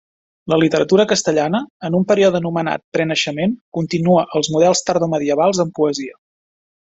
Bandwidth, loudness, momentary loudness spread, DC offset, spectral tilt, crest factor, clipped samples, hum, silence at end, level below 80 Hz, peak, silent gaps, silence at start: 8.2 kHz; -17 LUFS; 7 LU; under 0.1%; -5 dB/octave; 16 dB; under 0.1%; none; 0.85 s; -56 dBFS; 0 dBFS; 1.70-1.80 s, 2.84-2.92 s, 3.61-3.72 s; 0.45 s